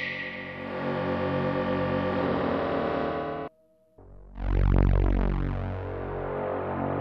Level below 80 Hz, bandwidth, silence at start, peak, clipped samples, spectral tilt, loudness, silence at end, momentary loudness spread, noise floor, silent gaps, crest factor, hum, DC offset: -32 dBFS; 5.6 kHz; 0 s; -8 dBFS; under 0.1%; -9 dB/octave; -29 LUFS; 0 s; 10 LU; -63 dBFS; none; 20 dB; none; under 0.1%